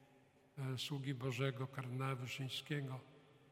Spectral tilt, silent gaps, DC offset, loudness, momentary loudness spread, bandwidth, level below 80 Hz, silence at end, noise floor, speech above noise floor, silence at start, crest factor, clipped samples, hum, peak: -5.5 dB/octave; none; under 0.1%; -44 LUFS; 9 LU; 16 kHz; -82 dBFS; 0 s; -70 dBFS; 26 dB; 0 s; 20 dB; under 0.1%; none; -24 dBFS